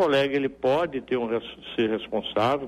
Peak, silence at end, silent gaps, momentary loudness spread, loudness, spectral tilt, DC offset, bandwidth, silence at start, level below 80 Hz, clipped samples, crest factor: -12 dBFS; 0 s; none; 6 LU; -26 LUFS; -6 dB/octave; under 0.1%; 13 kHz; 0 s; -58 dBFS; under 0.1%; 14 dB